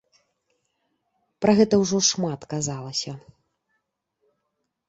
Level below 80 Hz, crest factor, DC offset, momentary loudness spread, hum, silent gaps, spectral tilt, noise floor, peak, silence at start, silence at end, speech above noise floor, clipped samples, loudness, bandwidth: -60 dBFS; 22 dB; under 0.1%; 11 LU; none; none; -4 dB/octave; -78 dBFS; -4 dBFS; 1.4 s; 1.7 s; 56 dB; under 0.1%; -22 LUFS; 8 kHz